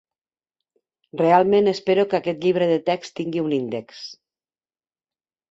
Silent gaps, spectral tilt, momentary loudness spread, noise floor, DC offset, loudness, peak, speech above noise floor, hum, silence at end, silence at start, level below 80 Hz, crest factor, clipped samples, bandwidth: none; -6.5 dB/octave; 18 LU; under -90 dBFS; under 0.1%; -21 LUFS; -2 dBFS; over 70 dB; none; 1.35 s; 1.15 s; -66 dBFS; 20 dB; under 0.1%; 7.8 kHz